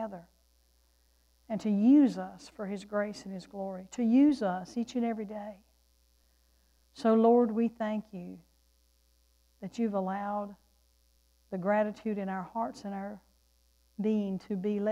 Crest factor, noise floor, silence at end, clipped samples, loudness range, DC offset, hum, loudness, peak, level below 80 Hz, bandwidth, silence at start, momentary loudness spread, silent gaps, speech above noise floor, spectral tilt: 18 dB; -68 dBFS; 0 s; under 0.1%; 7 LU; under 0.1%; none; -30 LUFS; -14 dBFS; -68 dBFS; 10.5 kHz; 0 s; 19 LU; none; 38 dB; -7.5 dB/octave